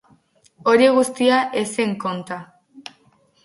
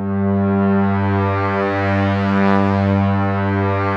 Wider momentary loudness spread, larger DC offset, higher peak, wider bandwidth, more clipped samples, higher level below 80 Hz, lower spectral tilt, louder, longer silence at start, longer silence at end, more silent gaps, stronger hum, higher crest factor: first, 25 LU vs 3 LU; neither; about the same, -2 dBFS vs -2 dBFS; first, 11.5 kHz vs 6 kHz; neither; second, -68 dBFS vs -58 dBFS; second, -4.5 dB/octave vs -9 dB/octave; about the same, -19 LUFS vs -17 LUFS; first, 0.65 s vs 0 s; first, 0.65 s vs 0 s; neither; neither; about the same, 18 dB vs 14 dB